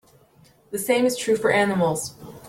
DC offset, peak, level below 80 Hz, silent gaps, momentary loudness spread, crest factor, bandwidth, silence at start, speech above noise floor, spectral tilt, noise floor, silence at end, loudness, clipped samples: under 0.1%; -8 dBFS; -60 dBFS; none; 11 LU; 16 dB; 16.5 kHz; 0.7 s; 34 dB; -4.5 dB/octave; -55 dBFS; 0 s; -22 LUFS; under 0.1%